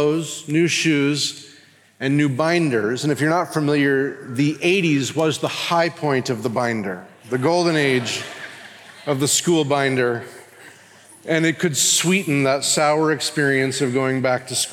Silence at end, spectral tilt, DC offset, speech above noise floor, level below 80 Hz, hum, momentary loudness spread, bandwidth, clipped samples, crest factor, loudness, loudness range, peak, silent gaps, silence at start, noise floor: 0 s; -4 dB/octave; under 0.1%; 30 dB; -74 dBFS; none; 10 LU; 17 kHz; under 0.1%; 16 dB; -19 LUFS; 3 LU; -6 dBFS; none; 0 s; -49 dBFS